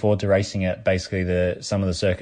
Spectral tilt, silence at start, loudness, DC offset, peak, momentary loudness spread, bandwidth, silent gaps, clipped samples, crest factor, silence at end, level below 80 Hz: -6 dB/octave; 0 s; -23 LUFS; under 0.1%; -6 dBFS; 4 LU; 10 kHz; none; under 0.1%; 16 dB; 0 s; -50 dBFS